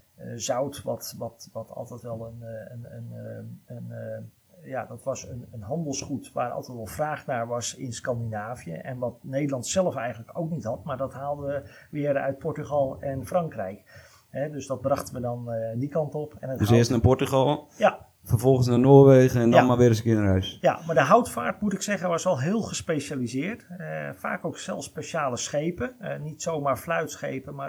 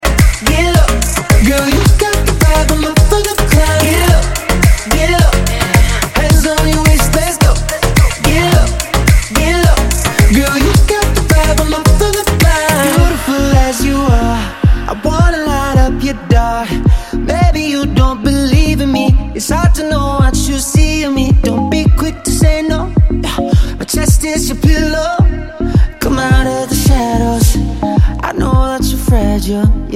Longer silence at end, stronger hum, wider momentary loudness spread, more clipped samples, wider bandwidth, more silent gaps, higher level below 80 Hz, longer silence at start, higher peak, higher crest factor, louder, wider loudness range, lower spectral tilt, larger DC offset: about the same, 0 s vs 0 s; neither; first, 18 LU vs 4 LU; neither; first, over 20 kHz vs 17 kHz; neither; second, -54 dBFS vs -14 dBFS; first, 0.2 s vs 0 s; about the same, -2 dBFS vs 0 dBFS; first, 24 dB vs 10 dB; second, -25 LUFS vs -12 LUFS; first, 16 LU vs 2 LU; about the same, -6 dB/octave vs -5 dB/octave; second, under 0.1% vs 0.5%